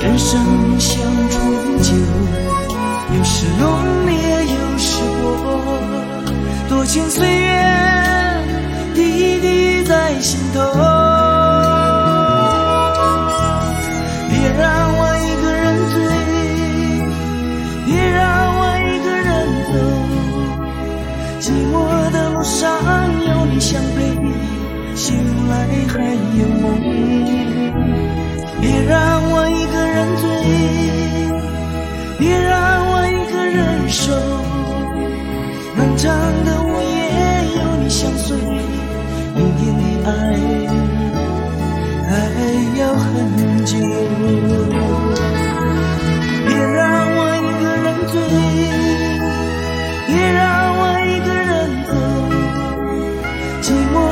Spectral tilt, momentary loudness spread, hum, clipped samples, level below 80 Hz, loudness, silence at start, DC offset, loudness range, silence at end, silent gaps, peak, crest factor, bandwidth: -5.5 dB/octave; 7 LU; none; under 0.1%; -26 dBFS; -16 LUFS; 0 s; under 0.1%; 4 LU; 0 s; none; 0 dBFS; 14 dB; 17 kHz